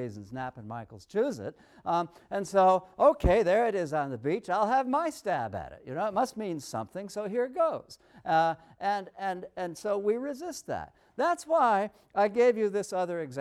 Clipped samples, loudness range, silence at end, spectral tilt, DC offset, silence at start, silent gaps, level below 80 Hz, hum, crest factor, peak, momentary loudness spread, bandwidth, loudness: under 0.1%; 5 LU; 0 s; -5.5 dB/octave; under 0.1%; 0 s; none; -48 dBFS; none; 18 dB; -12 dBFS; 14 LU; 14.5 kHz; -29 LUFS